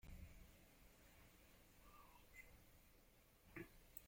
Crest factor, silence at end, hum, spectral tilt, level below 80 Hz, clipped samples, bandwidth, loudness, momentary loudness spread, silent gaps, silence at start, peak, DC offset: 28 dB; 0 s; none; -4.5 dB/octave; -70 dBFS; under 0.1%; 16.5 kHz; -65 LUFS; 10 LU; none; 0 s; -36 dBFS; under 0.1%